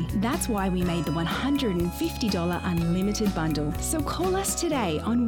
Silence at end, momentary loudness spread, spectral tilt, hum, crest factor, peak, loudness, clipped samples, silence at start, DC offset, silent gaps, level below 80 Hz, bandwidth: 0 s; 2 LU; -5 dB/octave; none; 12 dB; -14 dBFS; -26 LUFS; under 0.1%; 0 s; under 0.1%; none; -38 dBFS; over 20 kHz